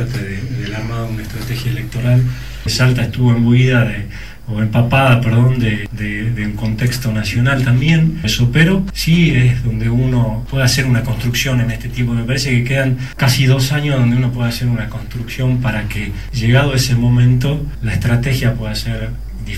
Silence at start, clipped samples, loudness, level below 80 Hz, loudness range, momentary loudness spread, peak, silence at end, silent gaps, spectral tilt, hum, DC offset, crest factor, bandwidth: 0 s; under 0.1%; -15 LUFS; -30 dBFS; 2 LU; 11 LU; 0 dBFS; 0 s; none; -6 dB/octave; none; 2%; 14 dB; 14.5 kHz